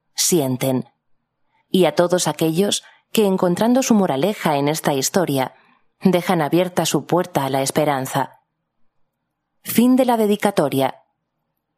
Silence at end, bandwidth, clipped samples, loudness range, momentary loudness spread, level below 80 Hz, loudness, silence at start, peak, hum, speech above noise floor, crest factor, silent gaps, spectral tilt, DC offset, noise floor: 0.85 s; 15.5 kHz; under 0.1%; 3 LU; 8 LU; -66 dBFS; -19 LUFS; 0.15 s; 0 dBFS; none; 57 dB; 20 dB; none; -4.5 dB/octave; under 0.1%; -75 dBFS